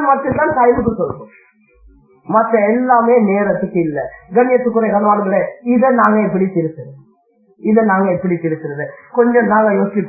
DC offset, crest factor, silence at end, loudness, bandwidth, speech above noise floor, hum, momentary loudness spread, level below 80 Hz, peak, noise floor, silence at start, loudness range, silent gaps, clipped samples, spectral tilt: under 0.1%; 14 dB; 0 s; -14 LUFS; 2.7 kHz; 40 dB; none; 11 LU; -48 dBFS; 0 dBFS; -54 dBFS; 0 s; 2 LU; none; under 0.1%; -12.5 dB/octave